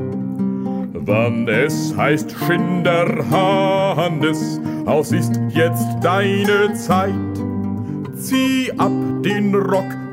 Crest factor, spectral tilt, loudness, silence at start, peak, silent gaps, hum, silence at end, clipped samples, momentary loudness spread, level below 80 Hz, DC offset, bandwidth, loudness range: 16 dB; -6 dB/octave; -18 LUFS; 0 s; -2 dBFS; none; none; 0 s; under 0.1%; 7 LU; -56 dBFS; under 0.1%; 16 kHz; 2 LU